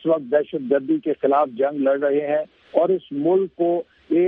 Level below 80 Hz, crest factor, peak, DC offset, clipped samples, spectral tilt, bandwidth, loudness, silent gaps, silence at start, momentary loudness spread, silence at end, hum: -70 dBFS; 18 dB; -2 dBFS; under 0.1%; under 0.1%; -10 dB/octave; 3.9 kHz; -21 LUFS; none; 0.05 s; 4 LU; 0 s; none